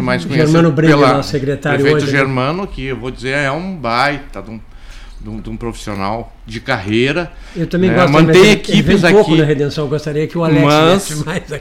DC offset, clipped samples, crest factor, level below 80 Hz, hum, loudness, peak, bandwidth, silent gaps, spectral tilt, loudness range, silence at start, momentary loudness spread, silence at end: under 0.1%; under 0.1%; 14 dB; -34 dBFS; none; -13 LUFS; 0 dBFS; 15 kHz; none; -6 dB/octave; 10 LU; 0 s; 16 LU; 0 s